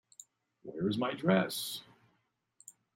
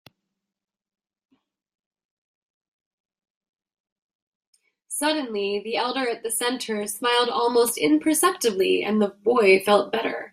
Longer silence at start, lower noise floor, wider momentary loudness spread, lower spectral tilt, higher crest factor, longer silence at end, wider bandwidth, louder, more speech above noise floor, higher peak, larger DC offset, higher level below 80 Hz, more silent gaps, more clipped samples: second, 0.65 s vs 4.9 s; second, -78 dBFS vs -83 dBFS; first, 26 LU vs 9 LU; first, -5 dB/octave vs -3 dB/octave; about the same, 22 dB vs 20 dB; first, 1.15 s vs 0.05 s; about the same, 16 kHz vs 16 kHz; second, -33 LUFS vs -22 LUFS; second, 46 dB vs 61 dB; second, -14 dBFS vs -4 dBFS; neither; about the same, -76 dBFS vs -72 dBFS; neither; neither